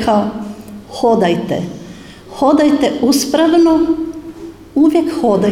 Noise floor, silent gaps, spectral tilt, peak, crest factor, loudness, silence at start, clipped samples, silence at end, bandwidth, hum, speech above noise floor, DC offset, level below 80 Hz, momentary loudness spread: -34 dBFS; none; -5.5 dB/octave; -2 dBFS; 12 dB; -13 LUFS; 0 s; under 0.1%; 0 s; 16 kHz; none; 22 dB; under 0.1%; -44 dBFS; 21 LU